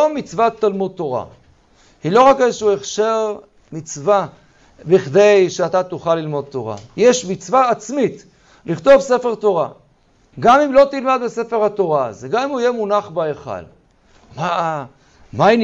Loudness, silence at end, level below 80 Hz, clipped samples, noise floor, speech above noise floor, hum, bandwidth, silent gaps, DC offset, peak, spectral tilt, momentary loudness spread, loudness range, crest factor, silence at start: -16 LUFS; 0 s; -52 dBFS; under 0.1%; -55 dBFS; 39 dB; none; 8 kHz; none; under 0.1%; -2 dBFS; -5 dB/octave; 16 LU; 5 LU; 14 dB; 0 s